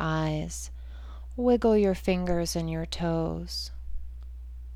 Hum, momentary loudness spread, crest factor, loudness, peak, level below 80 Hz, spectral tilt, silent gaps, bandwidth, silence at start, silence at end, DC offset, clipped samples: 60 Hz at -40 dBFS; 20 LU; 16 dB; -28 LUFS; -12 dBFS; -40 dBFS; -6 dB/octave; none; 16 kHz; 0 s; 0 s; under 0.1%; under 0.1%